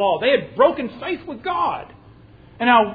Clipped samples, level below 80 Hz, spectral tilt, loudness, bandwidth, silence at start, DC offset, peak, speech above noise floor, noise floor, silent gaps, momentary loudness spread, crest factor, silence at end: under 0.1%; -54 dBFS; -8 dB/octave; -20 LUFS; 5 kHz; 0 s; under 0.1%; -2 dBFS; 27 dB; -46 dBFS; none; 11 LU; 18 dB; 0 s